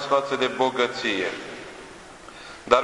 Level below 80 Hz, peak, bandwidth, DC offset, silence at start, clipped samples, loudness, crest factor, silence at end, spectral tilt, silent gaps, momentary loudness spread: -58 dBFS; -2 dBFS; 11.5 kHz; under 0.1%; 0 s; under 0.1%; -24 LUFS; 22 dB; 0 s; -3.5 dB/octave; none; 20 LU